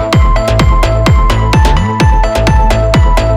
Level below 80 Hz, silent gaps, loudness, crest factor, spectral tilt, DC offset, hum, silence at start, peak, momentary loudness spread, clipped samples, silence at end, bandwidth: -10 dBFS; none; -10 LUFS; 8 dB; -6 dB/octave; under 0.1%; none; 0 s; 0 dBFS; 1 LU; under 0.1%; 0 s; 13.5 kHz